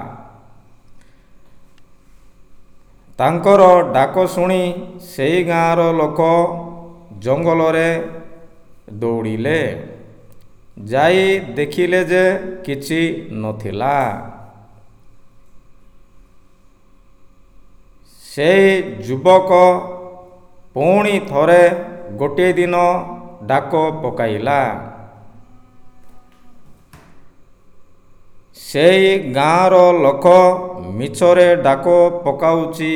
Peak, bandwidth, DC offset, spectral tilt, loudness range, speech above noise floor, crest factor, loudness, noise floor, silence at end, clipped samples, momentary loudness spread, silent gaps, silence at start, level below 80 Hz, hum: 0 dBFS; 16 kHz; under 0.1%; -6 dB/octave; 10 LU; 33 dB; 16 dB; -14 LUFS; -47 dBFS; 0 s; under 0.1%; 19 LU; none; 0 s; -50 dBFS; none